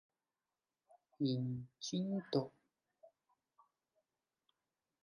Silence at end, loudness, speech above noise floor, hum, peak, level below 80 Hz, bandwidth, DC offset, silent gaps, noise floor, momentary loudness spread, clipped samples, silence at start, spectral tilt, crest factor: 1.95 s; -41 LUFS; over 51 dB; none; -22 dBFS; -82 dBFS; 10.5 kHz; under 0.1%; none; under -90 dBFS; 6 LU; under 0.1%; 1.2 s; -6.5 dB/octave; 22 dB